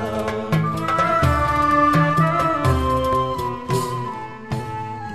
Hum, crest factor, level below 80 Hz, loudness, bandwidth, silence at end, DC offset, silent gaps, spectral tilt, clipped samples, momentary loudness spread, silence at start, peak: none; 14 dB; -34 dBFS; -20 LUFS; 14 kHz; 0 s; 0.6%; none; -6.5 dB/octave; under 0.1%; 13 LU; 0 s; -6 dBFS